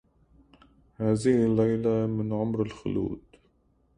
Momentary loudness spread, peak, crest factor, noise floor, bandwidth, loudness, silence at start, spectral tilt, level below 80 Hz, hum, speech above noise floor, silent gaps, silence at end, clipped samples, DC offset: 9 LU; -12 dBFS; 16 dB; -66 dBFS; 11 kHz; -27 LUFS; 1 s; -8 dB/octave; -54 dBFS; none; 41 dB; none; 0.8 s; under 0.1%; under 0.1%